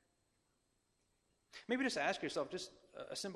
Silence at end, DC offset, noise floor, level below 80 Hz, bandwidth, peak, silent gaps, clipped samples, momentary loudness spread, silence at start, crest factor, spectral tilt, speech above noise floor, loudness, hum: 0 s; under 0.1%; -81 dBFS; -80 dBFS; 14 kHz; -22 dBFS; none; under 0.1%; 18 LU; 1.55 s; 22 dB; -3 dB/octave; 40 dB; -40 LUFS; none